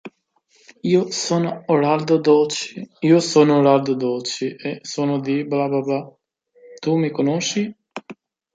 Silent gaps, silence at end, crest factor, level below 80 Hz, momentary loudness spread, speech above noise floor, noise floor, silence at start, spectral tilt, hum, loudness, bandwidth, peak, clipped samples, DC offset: none; 0.4 s; 18 dB; -68 dBFS; 13 LU; 44 dB; -62 dBFS; 0.05 s; -5.5 dB/octave; none; -19 LUFS; 9.4 kHz; -2 dBFS; under 0.1%; under 0.1%